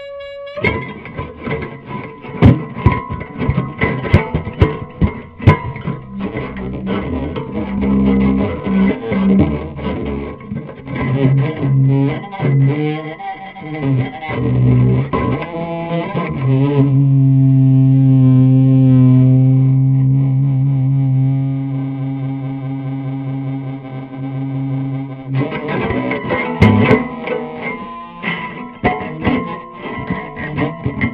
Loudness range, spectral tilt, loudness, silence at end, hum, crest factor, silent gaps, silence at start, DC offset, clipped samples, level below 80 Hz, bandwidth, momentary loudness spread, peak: 10 LU; -10.5 dB/octave; -16 LUFS; 0 s; none; 14 dB; none; 0 s; under 0.1%; under 0.1%; -32 dBFS; 4.5 kHz; 16 LU; 0 dBFS